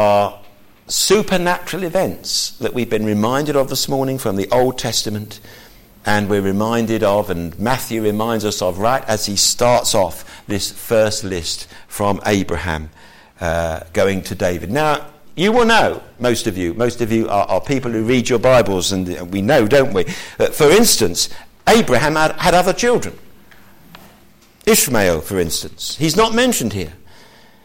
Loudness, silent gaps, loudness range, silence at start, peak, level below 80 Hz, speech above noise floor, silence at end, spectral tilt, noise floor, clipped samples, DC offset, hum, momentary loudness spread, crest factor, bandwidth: -17 LUFS; none; 5 LU; 0 s; -2 dBFS; -38 dBFS; 32 dB; 0.45 s; -4 dB/octave; -48 dBFS; under 0.1%; under 0.1%; none; 10 LU; 16 dB; 17 kHz